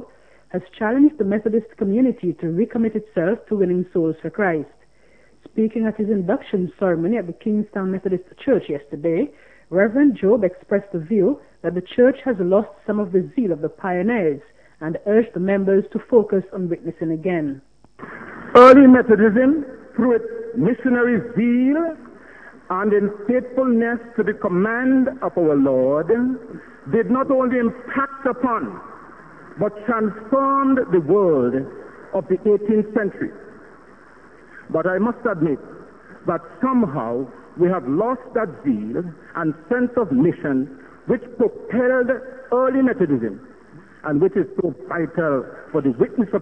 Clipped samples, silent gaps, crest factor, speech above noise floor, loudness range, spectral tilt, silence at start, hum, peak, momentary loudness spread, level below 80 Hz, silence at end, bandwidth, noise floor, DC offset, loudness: under 0.1%; none; 20 dB; 36 dB; 8 LU; -9 dB/octave; 0 s; none; 0 dBFS; 10 LU; -56 dBFS; 0 s; 6.2 kHz; -55 dBFS; 0.2%; -19 LUFS